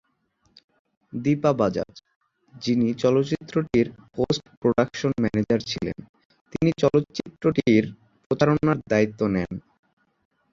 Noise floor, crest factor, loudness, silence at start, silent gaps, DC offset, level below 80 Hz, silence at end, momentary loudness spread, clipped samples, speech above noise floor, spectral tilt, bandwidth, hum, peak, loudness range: -68 dBFS; 20 dB; -24 LUFS; 1.15 s; 2.16-2.21 s, 4.57-4.62 s, 6.09-6.14 s, 6.25-6.30 s, 6.41-6.45 s, 8.26-8.30 s; under 0.1%; -52 dBFS; 0.95 s; 12 LU; under 0.1%; 45 dB; -7 dB/octave; 7.6 kHz; none; -4 dBFS; 2 LU